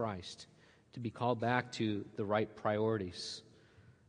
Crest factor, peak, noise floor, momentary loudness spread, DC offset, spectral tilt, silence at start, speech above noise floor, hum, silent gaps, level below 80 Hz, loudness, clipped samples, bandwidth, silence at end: 22 dB; -16 dBFS; -63 dBFS; 15 LU; under 0.1%; -6 dB/octave; 0 s; 26 dB; none; none; -76 dBFS; -37 LUFS; under 0.1%; 10.5 kHz; 0.15 s